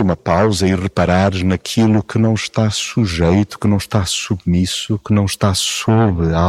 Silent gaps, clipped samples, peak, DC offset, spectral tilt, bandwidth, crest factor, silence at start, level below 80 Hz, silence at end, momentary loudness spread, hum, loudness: none; under 0.1%; -2 dBFS; under 0.1%; -5.5 dB/octave; 15 kHz; 12 dB; 0 s; -34 dBFS; 0 s; 3 LU; none; -16 LUFS